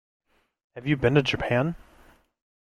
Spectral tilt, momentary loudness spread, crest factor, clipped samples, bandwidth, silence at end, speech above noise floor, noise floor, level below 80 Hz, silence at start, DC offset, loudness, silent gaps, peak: -7 dB/octave; 18 LU; 22 dB; under 0.1%; 10 kHz; 0.95 s; 33 dB; -57 dBFS; -50 dBFS; 0.75 s; under 0.1%; -25 LUFS; none; -6 dBFS